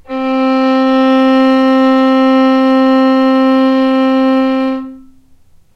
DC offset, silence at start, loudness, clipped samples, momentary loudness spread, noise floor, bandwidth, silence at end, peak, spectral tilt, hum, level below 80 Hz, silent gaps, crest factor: under 0.1%; 0.1 s; -10 LUFS; under 0.1%; 5 LU; -44 dBFS; 6.2 kHz; 0.75 s; -2 dBFS; -5.5 dB/octave; none; -50 dBFS; none; 8 dB